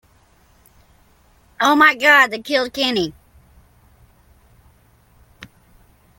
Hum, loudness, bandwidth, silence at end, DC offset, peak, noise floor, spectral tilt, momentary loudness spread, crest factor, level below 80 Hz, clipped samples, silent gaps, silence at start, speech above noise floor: none; -15 LUFS; 17 kHz; 0.75 s; under 0.1%; 0 dBFS; -55 dBFS; -3 dB/octave; 10 LU; 22 dB; -56 dBFS; under 0.1%; none; 1.6 s; 39 dB